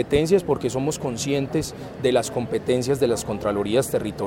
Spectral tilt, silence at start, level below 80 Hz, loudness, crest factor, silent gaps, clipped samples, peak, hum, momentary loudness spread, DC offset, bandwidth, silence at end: -5 dB/octave; 0 s; -46 dBFS; -23 LUFS; 18 dB; none; under 0.1%; -6 dBFS; none; 6 LU; under 0.1%; 17 kHz; 0 s